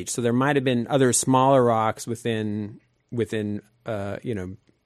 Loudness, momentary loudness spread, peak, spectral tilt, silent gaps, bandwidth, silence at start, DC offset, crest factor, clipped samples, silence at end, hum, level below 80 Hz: -23 LUFS; 15 LU; -6 dBFS; -5 dB/octave; none; 13.5 kHz; 0 s; under 0.1%; 16 dB; under 0.1%; 0.3 s; none; -62 dBFS